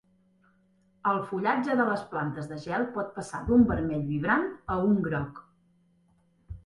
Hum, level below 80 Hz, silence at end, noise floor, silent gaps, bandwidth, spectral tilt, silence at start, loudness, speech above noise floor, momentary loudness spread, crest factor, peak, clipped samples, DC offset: none; -50 dBFS; 0.05 s; -66 dBFS; none; 11.5 kHz; -7.5 dB/octave; 1.05 s; -28 LUFS; 39 dB; 11 LU; 20 dB; -10 dBFS; under 0.1%; under 0.1%